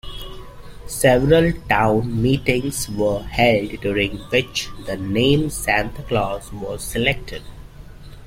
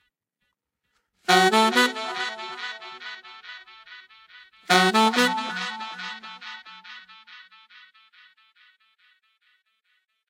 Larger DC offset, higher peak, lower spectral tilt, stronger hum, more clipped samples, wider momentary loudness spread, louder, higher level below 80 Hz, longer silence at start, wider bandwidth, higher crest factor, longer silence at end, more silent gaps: neither; about the same, -2 dBFS vs -2 dBFS; first, -5 dB/octave vs -3 dB/octave; neither; neither; second, 14 LU vs 26 LU; about the same, -20 LUFS vs -22 LUFS; first, -36 dBFS vs -82 dBFS; second, 0.05 s vs 1.3 s; about the same, 16.5 kHz vs 16 kHz; second, 18 dB vs 26 dB; second, 0 s vs 2.85 s; neither